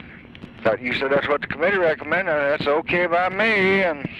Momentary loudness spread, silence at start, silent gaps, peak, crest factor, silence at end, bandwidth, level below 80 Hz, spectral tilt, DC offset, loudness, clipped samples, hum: 5 LU; 0 s; none; -8 dBFS; 14 dB; 0 s; 10 kHz; -52 dBFS; -6.5 dB/octave; under 0.1%; -20 LUFS; under 0.1%; none